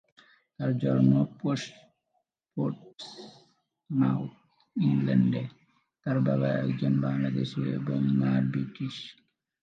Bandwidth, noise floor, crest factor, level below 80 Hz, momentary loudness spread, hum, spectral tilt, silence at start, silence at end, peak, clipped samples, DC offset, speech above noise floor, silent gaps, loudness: 7.6 kHz; -78 dBFS; 18 dB; -72 dBFS; 17 LU; none; -8 dB/octave; 0.6 s; 0.5 s; -10 dBFS; under 0.1%; under 0.1%; 51 dB; none; -28 LUFS